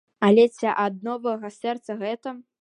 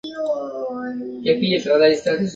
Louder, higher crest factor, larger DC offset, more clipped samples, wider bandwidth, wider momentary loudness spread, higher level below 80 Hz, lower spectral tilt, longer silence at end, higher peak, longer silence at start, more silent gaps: second, -23 LUFS vs -20 LUFS; about the same, 18 dB vs 18 dB; neither; neither; first, 10 kHz vs 8 kHz; about the same, 13 LU vs 12 LU; second, -78 dBFS vs -60 dBFS; about the same, -6.5 dB/octave vs -5.5 dB/octave; first, 0.2 s vs 0 s; second, -6 dBFS vs -2 dBFS; first, 0.2 s vs 0.05 s; neither